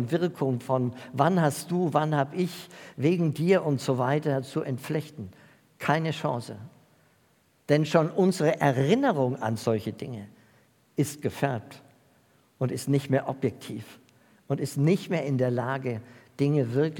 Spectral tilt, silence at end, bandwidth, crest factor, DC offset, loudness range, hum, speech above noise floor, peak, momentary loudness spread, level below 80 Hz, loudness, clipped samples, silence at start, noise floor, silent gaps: -6.5 dB/octave; 0 s; 18 kHz; 22 dB; under 0.1%; 6 LU; none; 39 dB; -6 dBFS; 15 LU; -74 dBFS; -27 LUFS; under 0.1%; 0 s; -65 dBFS; none